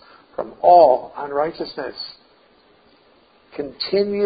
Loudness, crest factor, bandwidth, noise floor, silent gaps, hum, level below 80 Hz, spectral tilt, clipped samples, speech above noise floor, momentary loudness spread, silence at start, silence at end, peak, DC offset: -18 LUFS; 18 dB; 5 kHz; -55 dBFS; none; none; -60 dBFS; -9.5 dB/octave; under 0.1%; 37 dB; 21 LU; 0.4 s; 0 s; -2 dBFS; under 0.1%